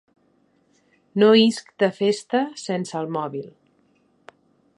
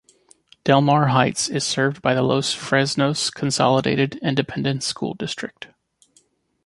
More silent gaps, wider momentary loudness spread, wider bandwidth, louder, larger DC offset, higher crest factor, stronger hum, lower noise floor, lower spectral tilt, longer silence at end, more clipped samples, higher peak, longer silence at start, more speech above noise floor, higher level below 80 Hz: neither; first, 16 LU vs 11 LU; about the same, 11 kHz vs 11.5 kHz; about the same, -21 LUFS vs -20 LUFS; neither; about the same, 20 dB vs 20 dB; neither; about the same, -63 dBFS vs -61 dBFS; about the same, -5 dB/octave vs -4.5 dB/octave; first, 1.3 s vs 1 s; neither; about the same, -4 dBFS vs -2 dBFS; first, 1.15 s vs 0.65 s; about the same, 43 dB vs 41 dB; second, -76 dBFS vs -58 dBFS